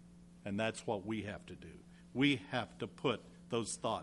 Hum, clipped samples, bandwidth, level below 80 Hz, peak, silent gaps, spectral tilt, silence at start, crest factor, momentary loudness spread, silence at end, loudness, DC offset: none; under 0.1%; 11.5 kHz; -68 dBFS; -18 dBFS; none; -4.5 dB/octave; 0 s; 20 dB; 18 LU; 0 s; -38 LUFS; under 0.1%